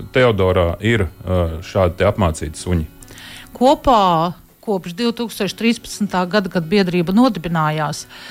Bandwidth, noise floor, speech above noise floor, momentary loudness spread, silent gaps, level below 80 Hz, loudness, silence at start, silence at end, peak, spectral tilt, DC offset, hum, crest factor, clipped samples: 16.5 kHz; -37 dBFS; 20 dB; 10 LU; none; -36 dBFS; -18 LUFS; 0 s; 0 s; -2 dBFS; -6 dB/octave; under 0.1%; none; 14 dB; under 0.1%